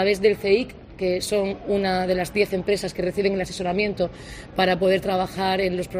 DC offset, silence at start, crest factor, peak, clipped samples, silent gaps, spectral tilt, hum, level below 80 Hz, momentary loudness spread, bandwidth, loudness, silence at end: under 0.1%; 0 s; 18 dB; -6 dBFS; under 0.1%; none; -5 dB/octave; none; -46 dBFS; 7 LU; 15.5 kHz; -23 LUFS; 0 s